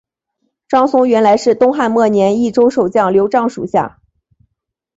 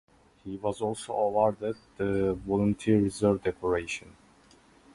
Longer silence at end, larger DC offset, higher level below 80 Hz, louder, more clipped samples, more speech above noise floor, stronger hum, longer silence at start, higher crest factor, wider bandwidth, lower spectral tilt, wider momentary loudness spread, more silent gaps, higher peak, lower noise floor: first, 1.1 s vs 0.85 s; neither; about the same, -54 dBFS vs -52 dBFS; first, -13 LUFS vs -29 LUFS; neither; first, 63 dB vs 31 dB; neither; first, 0.7 s vs 0.45 s; second, 12 dB vs 18 dB; second, 8 kHz vs 11.5 kHz; about the same, -6 dB/octave vs -6.5 dB/octave; second, 6 LU vs 11 LU; neither; first, -2 dBFS vs -10 dBFS; first, -75 dBFS vs -59 dBFS